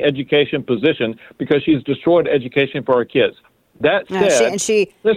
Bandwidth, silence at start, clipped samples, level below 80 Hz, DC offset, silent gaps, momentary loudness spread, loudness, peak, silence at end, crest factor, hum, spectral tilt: 15 kHz; 0 s; under 0.1%; -54 dBFS; under 0.1%; none; 5 LU; -17 LUFS; -2 dBFS; 0 s; 14 dB; none; -4.5 dB/octave